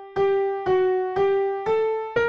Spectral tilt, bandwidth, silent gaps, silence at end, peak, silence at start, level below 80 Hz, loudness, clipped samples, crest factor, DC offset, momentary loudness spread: -7 dB/octave; 6.6 kHz; none; 0 s; -10 dBFS; 0 s; -56 dBFS; -23 LUFS; under 0.1%; 12 dB; 0.1%; 2 LU